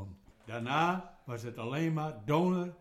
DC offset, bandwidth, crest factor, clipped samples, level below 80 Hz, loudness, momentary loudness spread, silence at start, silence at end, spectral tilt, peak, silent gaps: under 0.1%; 14.5 kHz; 20 dB; under 0.1%; -64 dBFS; -33 LUFS; 14 LU; 0 s; 0.05 s; -7 dB/octave; -14 dBFS; none